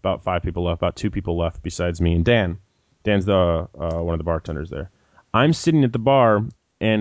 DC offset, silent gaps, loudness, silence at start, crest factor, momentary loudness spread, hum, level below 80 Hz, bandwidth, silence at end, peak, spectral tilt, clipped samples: under 0.1%; none; -21 LUFS; 0.05 s; 16 dB; 12 LU; none; -34 dBFS; 8 kHz; 0 s; -6 dBFS; -7 dB/octave; under 0.1%